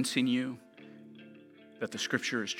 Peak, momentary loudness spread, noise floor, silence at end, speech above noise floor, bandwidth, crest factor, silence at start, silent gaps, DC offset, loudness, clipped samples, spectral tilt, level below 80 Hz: -12 dBFS; 23 LU; -55 dBFS; 0 s; 23 dB; 16.5 kHz; 22 dB; 0 s; none; under 0.1%; -33 LUFS; under 0.1%; -3.5 dB/octave; -84 dBFS